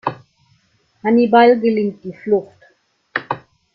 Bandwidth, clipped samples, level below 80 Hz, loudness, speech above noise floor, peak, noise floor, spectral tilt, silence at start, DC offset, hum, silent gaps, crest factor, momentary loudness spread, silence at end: 5.6 kHz; under 0.1%; -64 dBFS; -16 LUFS; 45 dB; -2 dBFS; -59 dBFS; -8.5 dB/octave; 0.05 s; under 0.1%; none; none; 16 dB; 17 LU; 0.35 s